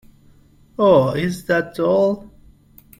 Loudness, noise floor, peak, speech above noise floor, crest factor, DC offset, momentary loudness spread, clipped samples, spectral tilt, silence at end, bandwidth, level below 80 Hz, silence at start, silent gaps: -18 LUFS; -50 dBFS; -2 dBFS; 34 dB; 18 dB; under 0.1%; 11 LU; under 0.1%; -7 dB/octave; 0.75 s; 16.5 kHz; -52 dBFS; 0.8 s; none